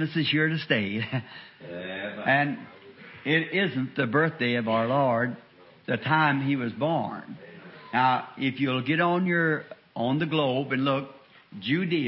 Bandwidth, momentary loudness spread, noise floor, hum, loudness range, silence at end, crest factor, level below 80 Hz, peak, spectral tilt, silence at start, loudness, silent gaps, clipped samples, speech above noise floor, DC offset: 5.8 kHz; 18 LU; -47 dBFS; none; 2 LU; 0 s; 18 dB; -70 dBFS; -8 dBFS; -10.5 dB/octave; 0 s; -26 LUFS; none; under 0.1%; 21 dB; under 0.1%